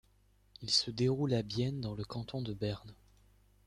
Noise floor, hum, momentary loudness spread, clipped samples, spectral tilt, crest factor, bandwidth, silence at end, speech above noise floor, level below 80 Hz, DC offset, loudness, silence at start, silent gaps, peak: -68 dBFS; 50 Hz at -60 dBFS; 10 LU; under 0.1%; -5 dB/octave; 22 dB; 11.5 kHz; 0.75 s; 33 dB; -60 dBFS; under 0.1%; -35 LUFS; 0.6 s; none; -14 dBFS